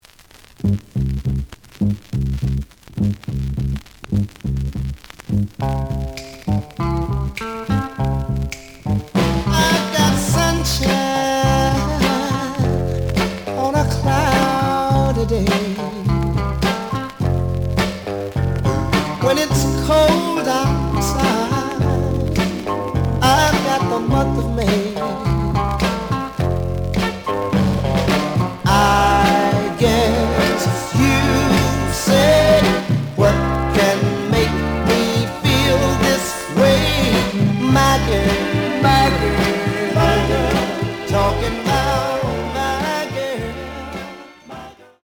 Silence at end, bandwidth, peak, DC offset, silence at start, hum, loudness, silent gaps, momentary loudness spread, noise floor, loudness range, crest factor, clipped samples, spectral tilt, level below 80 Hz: 0.3 s; over 20 kHz; -2 dBFS; under 0.1%; 0.6 s; none; -18 LUFS; none; 9 LU; -46 dBFS; 8 LU; 16 dB; under 0.1%; -5.5 dB/octave; -28 dBFS